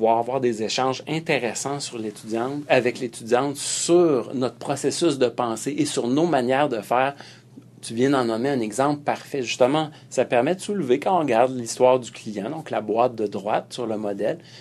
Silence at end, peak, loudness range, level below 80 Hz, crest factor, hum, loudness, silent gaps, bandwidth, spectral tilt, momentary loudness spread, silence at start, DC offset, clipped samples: 0 s; -4 dBFS; 2 LU; -70 dBFS; 20 dB; none; -23 LUFS; none; 13.5 kHz; -4.5 dB/octave; 9 LU; 0 s; under 0.1%; under 0.1%